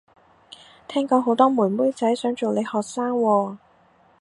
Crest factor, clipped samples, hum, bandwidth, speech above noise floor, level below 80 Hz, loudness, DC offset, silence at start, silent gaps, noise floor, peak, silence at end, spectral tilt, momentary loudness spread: 20 dB; under 0.1%; none; 11 kHz; 36 dB; -72 dBFS; -22 LUFS; under 0.1%; 0.9 s; none; -57 dBFS; -2 dBFS; 0.65 s; -6 dB/octave; 9 LU